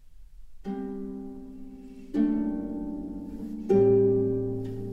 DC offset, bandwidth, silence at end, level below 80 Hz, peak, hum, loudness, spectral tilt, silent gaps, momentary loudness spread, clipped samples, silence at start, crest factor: under 0.1%; 3.9 kHz; 0 s; -48 dBFS; -12 dBFS; none; -28 LUFS; -10.5 dB/octave; none; 22 LU; under 0.1%; 0 s; 16 dB